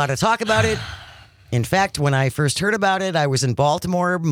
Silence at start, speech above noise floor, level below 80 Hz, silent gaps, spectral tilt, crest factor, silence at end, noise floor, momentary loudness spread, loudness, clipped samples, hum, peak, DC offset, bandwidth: 0 s; 25 dB; -48 dBFS; none; -5 dB/octave; 16 dB; 0 s; -44 dBFS; 7 LU; -19 LUFS; under 0.1%; none; -4 dBFS; under 0.1%; 17 kHz